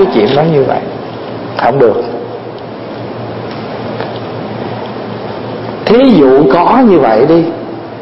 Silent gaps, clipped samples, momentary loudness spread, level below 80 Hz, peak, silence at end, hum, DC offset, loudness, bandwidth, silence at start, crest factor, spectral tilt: none; 0.2%; 16 LU; -44 dBFS; 0 dBFS; 0 s; none; under 0.1%; -10 LUFS; 5.8 kHz; 0 s; 10 dB; -9.5 dB/octave